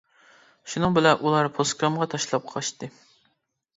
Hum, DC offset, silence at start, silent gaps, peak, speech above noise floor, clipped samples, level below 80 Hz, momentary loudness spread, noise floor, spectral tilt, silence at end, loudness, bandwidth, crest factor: none; under 0.1%; 0.65 s; none; -6 dBFS; 47 dB; under 0.1%; -60 dBFS; 17 LU; -71 dBFS; -4.5 dB/octave; 0.9 s; -24 LUFS; 8 kHz; 20 dB